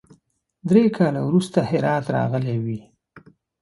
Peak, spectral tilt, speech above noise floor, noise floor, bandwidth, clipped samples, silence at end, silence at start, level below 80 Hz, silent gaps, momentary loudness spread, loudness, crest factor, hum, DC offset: -2 dBFS; -8 dB/octave; 42 dB; -62 dBFS; 11.5 kHz; under 0.1%; 0.45 s; 0.65 s; -60 dBFS; none; 11 LU; -21 LUFS; 18 dB; none; under 0.1%